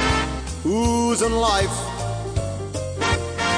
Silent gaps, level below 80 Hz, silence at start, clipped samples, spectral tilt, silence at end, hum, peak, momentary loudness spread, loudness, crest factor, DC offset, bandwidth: none; -32 dBFS; 0 s; under 0.1%; -4.5 dB/octave; 0 s; none; -8 dBFS; 8 LU; -22 LUFS; 14 dB; under 0.1%; 10.5 kHz